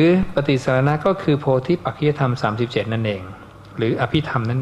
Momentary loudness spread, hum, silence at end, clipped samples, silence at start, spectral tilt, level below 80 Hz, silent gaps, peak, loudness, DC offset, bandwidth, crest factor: 7 LU; none; 0 s; under 0.1%; 0 s; -7.5 dB/octave; -42 dBFS; none; -4 dBFS; -20 LUFS; under 0.1%; 10.5 kHz; 16 dB